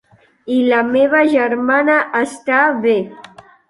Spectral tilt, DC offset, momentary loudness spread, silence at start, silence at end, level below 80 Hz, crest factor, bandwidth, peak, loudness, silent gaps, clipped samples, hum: -5 dB/octave; under 0.1%; 7 LU; 0.45 s; 0.5 s; -62 dBFS; 14 dB; 11.5 kHz; -2 dBFS; -14 LUFS; none; under 0.1%; none